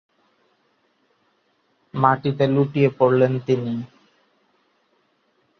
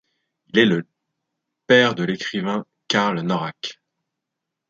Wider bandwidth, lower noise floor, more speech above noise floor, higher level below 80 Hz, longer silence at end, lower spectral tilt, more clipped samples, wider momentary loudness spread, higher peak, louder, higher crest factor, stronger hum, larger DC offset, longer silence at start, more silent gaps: second, 6.4 kHz vs 7.6 kHz; second, -66 dBFS vs -83 dBFS; second, 47 dB vs 63 dB; about the same, -64 dBFS vs -66 dBFS; first, 1.75 s vs 1 s; first, -9 dB/octave vs -5 dB/octave; neither; about the same, 13 LU vs 13 LU; about the same, -2 dBFS vs -2 dBFS; about the same, -20 LUFS vs -20 LUFS; about the same, 22 dB vs 20 dB; neither; neither; first, 1.95 s vs 0.55 s; neither